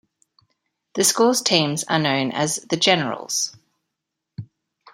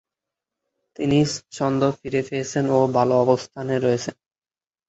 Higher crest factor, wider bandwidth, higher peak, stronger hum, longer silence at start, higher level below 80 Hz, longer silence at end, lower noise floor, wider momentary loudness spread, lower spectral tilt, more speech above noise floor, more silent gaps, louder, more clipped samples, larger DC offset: about the same, 22 dB vs 20 dB; first, 16 kHz vs 8.2 kHz; about the same, -2 dBFS vs -4 dBFS; neither; about the same, 0.95 s vs 1 s; second, -66 dBFS vs -58 dBFS; second, 0.5 s vs 0.75 s; second, -82 dBFS vs -86 dBFS; first, 21 LU vs 8 LU; second, -3 dB/octave vs -6 dB/octave; second, 61 dB vs 65 dB; neither; about the same, -20 LUFS vs -22 LUFS; neither; neither